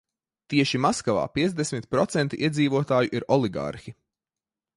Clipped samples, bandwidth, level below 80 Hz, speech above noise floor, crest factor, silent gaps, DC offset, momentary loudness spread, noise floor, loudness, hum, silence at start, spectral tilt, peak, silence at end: under 0.1%; 11.5 kHz; -58 dBFS; over 66 dB; 20 dB; none; under 0.1%; 6 LU; under -90 dBFS; -25 LUFS; none; 0.5 s; -5.5 dB/octave; -6 dBFS; 0.85 s